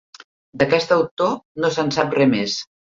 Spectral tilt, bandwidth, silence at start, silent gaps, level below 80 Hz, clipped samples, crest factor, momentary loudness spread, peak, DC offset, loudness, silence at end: -5 dB/octave; 7.6 kHz; 0.55 s; 1.11-1.17 s, 1.45-1.55 s; -58 dBFS; under 0.1%; 18 dB; 6 LU; -4 dBFS; under 0.1%; -19 LUFS; 0.25 s